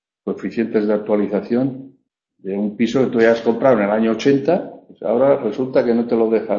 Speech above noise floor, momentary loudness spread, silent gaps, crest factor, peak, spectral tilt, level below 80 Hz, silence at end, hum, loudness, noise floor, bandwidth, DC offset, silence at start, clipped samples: 45 dB; 11 LU; none; 16 dB; 0 dBFS; -7 dB/octave; -58 dBFS; 0 s; none; -18 LUFS; -62 dBFS; 7.4 kHz; under 0.1%; 0.25 s; under 0.1%